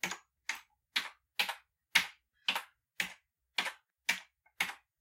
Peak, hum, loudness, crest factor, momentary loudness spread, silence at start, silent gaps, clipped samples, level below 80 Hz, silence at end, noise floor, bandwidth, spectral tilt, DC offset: -10 dBFS; none; -36 LUFS; 30 dB; 11 LU; 0.05 s; none; under 0.1%; -82 dBFS; 0.25 s; -59 dBFS; 16.5 kHz; 0.5 dB/octave; under 0.1%